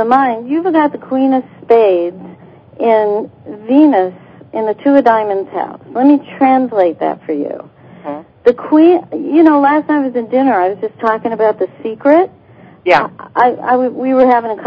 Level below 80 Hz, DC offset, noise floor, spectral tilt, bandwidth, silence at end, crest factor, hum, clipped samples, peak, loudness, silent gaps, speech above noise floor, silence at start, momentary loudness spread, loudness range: -58 dBFS; under 0.1%; -37 dBFS; -8 dB/octave; 5.6 kHz; 0 s; 12 dB; none; 0.3%; 0 dBFS; -13 LUFS; none; 25 dB; 0 s; 12 LU; 2 LU